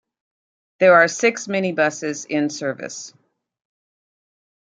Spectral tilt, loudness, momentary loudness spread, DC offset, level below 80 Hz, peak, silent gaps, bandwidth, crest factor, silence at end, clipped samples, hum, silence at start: -4 dB/octave; -18 LUFS; 18 LU; under 0.1%; -74 dBFS; -2 dBFS; none; 9.4 kHz; 20 dB; 1.55 s; under 0.1%; none; 0.8 s